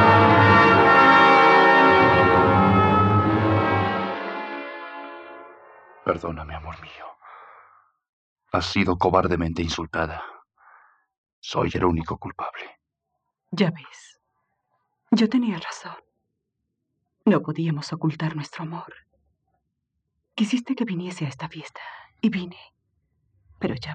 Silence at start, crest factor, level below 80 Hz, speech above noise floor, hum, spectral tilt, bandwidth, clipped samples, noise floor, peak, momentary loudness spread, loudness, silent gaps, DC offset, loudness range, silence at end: 0 s; 18 dB; -50 dBFS; 54 dB; none; -6.5 dB/octave; 9.2 kHz; under 0.1%; -80 dBFS; -4 dBFS; 24 LU; -19 LUFS; 8.09-8.36 s, 11.18-11.24 s, 11.33-11.42 s; under 0.1%; 15 LU; 0 s